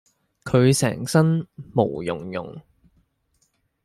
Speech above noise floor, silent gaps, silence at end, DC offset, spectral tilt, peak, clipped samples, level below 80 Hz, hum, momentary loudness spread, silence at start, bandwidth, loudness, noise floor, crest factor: 47 dB; none; 1.25 s; under 0.1%; -6 dB/octave; -4 dBFS; under 0.1%; -56 dBFS; none; 15 LU; 0.45 s; 14.5 kHz; -22 LUFS; -68 dBFS; 20 dB